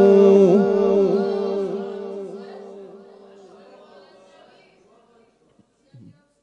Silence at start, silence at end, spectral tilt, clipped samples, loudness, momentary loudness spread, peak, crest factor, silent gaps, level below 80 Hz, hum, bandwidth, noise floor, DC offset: 0 s; 3.45 s; -8.5 dB/octave; under 0.1%; -18 LUFS; 26 LU; -4 dBFS; 18 dB; none; -74 dBFS; none; 6.8 kHz; -60 dBFS; under 0.1%